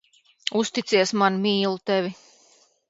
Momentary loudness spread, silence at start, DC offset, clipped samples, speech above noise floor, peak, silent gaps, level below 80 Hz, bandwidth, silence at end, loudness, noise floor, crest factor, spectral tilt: 7 LU; 0.45 s; under 0.1%; under 0.1%; 37 dB; -4 dBFS; none; -72 dBFS; 8 kHz; 0.75 s; -23 LUFS; -59 dBFS; 22 dB; -4 dB/octave